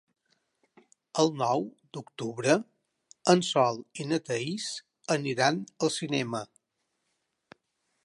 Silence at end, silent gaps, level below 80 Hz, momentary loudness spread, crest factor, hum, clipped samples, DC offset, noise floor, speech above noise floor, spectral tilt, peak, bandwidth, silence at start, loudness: 1.6 s; none; -78 dBFS; 14 LU; 22 dB; none; under 0.1%; under 0.1%; -80 dBFS; 52 dB; -4.5 dB/octave; -8 dBFS; 11.5 kHz; 1.15 s; -29 LUFS